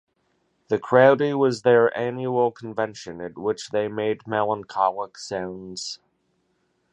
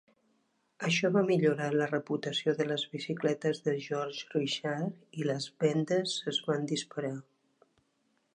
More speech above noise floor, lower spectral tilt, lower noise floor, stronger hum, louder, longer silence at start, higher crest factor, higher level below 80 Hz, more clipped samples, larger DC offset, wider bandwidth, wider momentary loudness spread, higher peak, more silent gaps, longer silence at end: about the same, 47 dB vs 44 dB; about the same, -5.5 dB/octave vs -5 dB/octave; second, -70 dBFS vs -75 dBFS; neither; first, -23 LUFS vs -32 LUFS; about the same, 0.7 s vs 0.8 s; about the same, 22 dB vs 18 dB; first, -66 dBFS vs -82 dBFS; neither; neither; about the same, 10 kHz vs 10.5 kHz; first, 16 LU vs 9 LU; first, -2 dBFS vs -14 dBFS; neither; second, 0.95 s vs 1.15 s